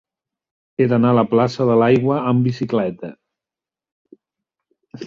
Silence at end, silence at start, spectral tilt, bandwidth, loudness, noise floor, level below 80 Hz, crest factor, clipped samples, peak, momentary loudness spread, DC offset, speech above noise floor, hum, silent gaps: 0 s; 0.8 s; -8.5 dB/octave; 7.2 kHz; -17 LUFS; -89 dBFS; -58 dBFS; 16 dB; under 0.1%; -2 dBFS; 13 LU; under 0.1%; 73 dB; none; 3.92-4.05 s